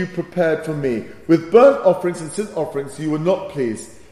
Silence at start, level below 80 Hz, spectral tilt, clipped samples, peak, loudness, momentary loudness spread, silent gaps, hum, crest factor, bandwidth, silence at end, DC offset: 0 s; -56 dBFS; -6.5 dB/octave; under 0.1%; 0 dBFS; -18 LUFS; 13 LU; none; none; 18 dB; 12.5 kHz; 0.15 s; under 0.1%